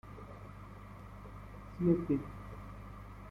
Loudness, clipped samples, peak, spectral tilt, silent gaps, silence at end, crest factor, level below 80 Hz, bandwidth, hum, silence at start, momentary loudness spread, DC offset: -35 LUFS; under 0.1%; -18 dBFS; -9.5 dB/octave; none; 0 s; 22 dB; -54 dBFS; 11 kHz; 50 Hz at -50 dBFS; 0.05 s; 19 LU; under 0.1%